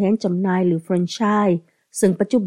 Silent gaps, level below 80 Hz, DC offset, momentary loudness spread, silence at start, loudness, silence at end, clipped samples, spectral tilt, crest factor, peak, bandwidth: none; -66 dBFS; under 0.1%; 5 LU; 0 s; -20 LUFS; 0 s; under 0.1%; -6.5 dB/octave; 14 dB; -4 dBFS; 14.5 kHz